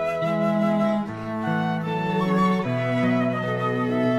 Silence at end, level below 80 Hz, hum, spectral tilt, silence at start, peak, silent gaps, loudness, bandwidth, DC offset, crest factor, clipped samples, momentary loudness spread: 0 s; -56 dBFS; none; -8 dB/octave; 0 s; -10 dBFS; none; -23 LUFS; 12.5 kHz; under 0.1%; 12 dB; under 0.1%; 4 LU